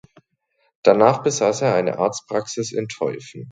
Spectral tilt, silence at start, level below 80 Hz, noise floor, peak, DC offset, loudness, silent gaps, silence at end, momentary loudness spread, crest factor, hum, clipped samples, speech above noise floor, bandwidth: -4.5 dB/octave; 0.85 s; -64 dBFS; -68 dBFS; 0 dBFS; under 0.1%; -20 LUFS; none; 0 s; 11 LU; 20 dB; none; under 0.1%; 48 dB; 9.4 kHz